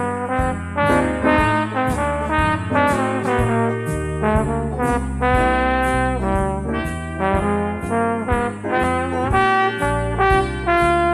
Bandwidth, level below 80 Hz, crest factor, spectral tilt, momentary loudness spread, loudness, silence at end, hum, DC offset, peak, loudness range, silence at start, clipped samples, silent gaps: 13.5 kHz; -30 dBFS; 16 dB; -6.5 dB/octave; 5 LU; -19 LUFS; 0 s; none; under 0.1%; -2 dBFS; 2 LU; 0 s; under 0.1%; none